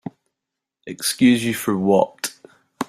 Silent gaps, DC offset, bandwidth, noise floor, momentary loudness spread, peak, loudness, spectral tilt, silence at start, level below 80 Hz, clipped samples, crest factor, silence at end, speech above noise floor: none; under 0.1%; 16 kHz; -84 dBFS; 16 LU; -2 dBFS; -19 LUFS; -4.5 dB/octave; 0.05 s; -62 dBFS; under 0.1%; 18 dB; 0.05 s; 65 dB